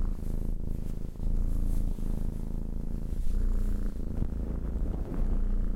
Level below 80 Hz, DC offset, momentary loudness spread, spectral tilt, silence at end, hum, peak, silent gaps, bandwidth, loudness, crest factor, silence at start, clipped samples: -30 dBFS; under 0.1%; 4 LU; -8.5 dB/octave; 0 s; none; -16 dBFS; none; 2.2 kHz; -36 LUFS; 12 dB; 0 s; under 0.1%